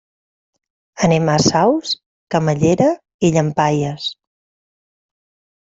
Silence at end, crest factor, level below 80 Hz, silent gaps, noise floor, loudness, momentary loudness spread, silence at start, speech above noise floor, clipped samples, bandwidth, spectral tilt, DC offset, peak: 1.6 s; 16 dB; -52 dBFS; 2.06-2.27 s, 3.14-3.19 s; under -90 dBFS; -17 LUFS; 9 LU; 0.95 s; over 75 dB; under 0.1%; 8 kHz; -5.5 dB/octave; under 0.1%; -2 dBFS